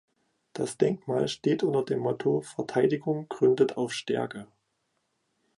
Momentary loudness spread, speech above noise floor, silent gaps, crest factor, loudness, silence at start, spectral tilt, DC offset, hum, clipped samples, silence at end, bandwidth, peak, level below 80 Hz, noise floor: 9 LU; 49 dB; none; 20 dB; -28 LUFS; 0.55 s; -6 dB/octave; under 0.1%; none; under 0.1%; 1.1 s; 11.5 kHz; -10 dBFS; -70 dBFS; -77 dBFS